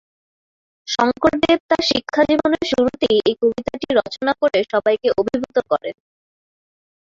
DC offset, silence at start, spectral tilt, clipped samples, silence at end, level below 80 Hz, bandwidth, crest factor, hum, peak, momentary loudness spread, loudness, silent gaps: under 0.1%; 0.85 s; -4.5 dB/octave; under 0.1%; 1.15 s; -50 dBFS; 7.8 kHz; 18 dB; none; -2 dBFS; 6 LU; -18 LUFS; 1.60-1.69 s